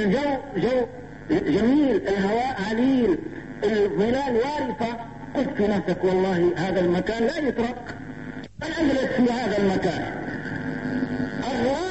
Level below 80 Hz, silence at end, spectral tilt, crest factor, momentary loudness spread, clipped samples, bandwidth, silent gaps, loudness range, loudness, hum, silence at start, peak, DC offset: -48 dBFS; 0 s; -6.5 dB/octave; 12 dB; 10 LU; under 0.1%; 8.4 kHz; none; 3 LU; -24 LUFS; none; 0 s; -10 dBFS; 0.3%